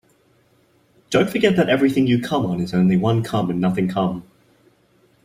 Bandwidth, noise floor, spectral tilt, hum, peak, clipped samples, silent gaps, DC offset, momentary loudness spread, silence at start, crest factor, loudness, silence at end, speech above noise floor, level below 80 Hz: 15.5 kHz; -59 dBFS; -7 dB/octave; none; -2 dBFS; under 0.1%; none; under 0.1%; 5 LU; 1.1 s; 18 dB; -19 LUFS; 1.05 s; 40 dB; -54 dBFS